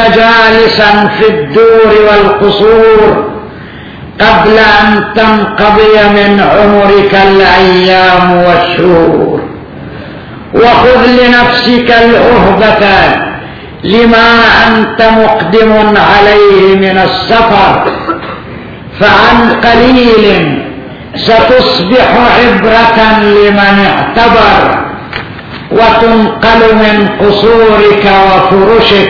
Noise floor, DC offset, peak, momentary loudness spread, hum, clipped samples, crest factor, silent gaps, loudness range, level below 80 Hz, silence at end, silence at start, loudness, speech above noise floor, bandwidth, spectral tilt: -24 dBFS; under 0.1%; 0 dBFS; 15 LU; none; 10%; 4 dB; none; 2 LU; -26 dBFS; 0 s; 0 s; -4 LUFS; 20 dB; 5.4 kHz; -6.5 dB/octave